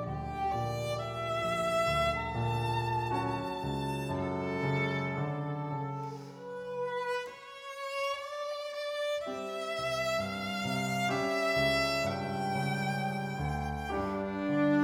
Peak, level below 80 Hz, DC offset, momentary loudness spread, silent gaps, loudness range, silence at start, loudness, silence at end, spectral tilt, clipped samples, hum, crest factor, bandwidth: -18 dBFS; -54 dBFS; under 0.1%; 8 LU; none; 6 LU; 0 s; -33 LUFS; 0 s; -5.5 dB/octave; under 0.1%; none; 14 dB; 19 kHz